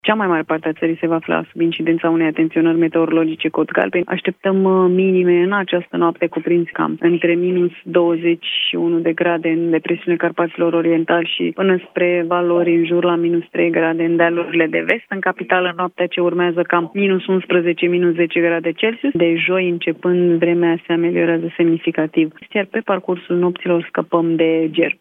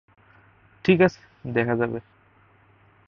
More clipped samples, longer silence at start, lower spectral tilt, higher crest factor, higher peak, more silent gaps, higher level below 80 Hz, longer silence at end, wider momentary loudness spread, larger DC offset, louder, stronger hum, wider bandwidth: neither; second, 0.05 s vs 0.85 s; about the same, -9 dB/octave vs -8 dB/octave; about the same, 16 dB vs 20 dB; first, 0 dBFS vs -6 dBFS; neither; second, -70 dBFS vs -58 dBFS; second, 0.1 s vs 1.05 s; second, 5 LU vs 14 LU; neither; first, -17 LUFS vs -23 LUFS; neither; second, 3.9 kHz vs 6.8 kHz